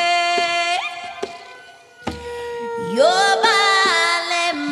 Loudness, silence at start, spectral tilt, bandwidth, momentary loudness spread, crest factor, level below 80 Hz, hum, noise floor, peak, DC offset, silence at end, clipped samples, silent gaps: -17 LUFS; 0 s; -1.5 dB/octave; 13.5 kHz; 17 LU; 16 dB; -54 dBFS; none; -43 dBFS; -4 dBFS; under 0.1%; 0 s; under 0.1%; none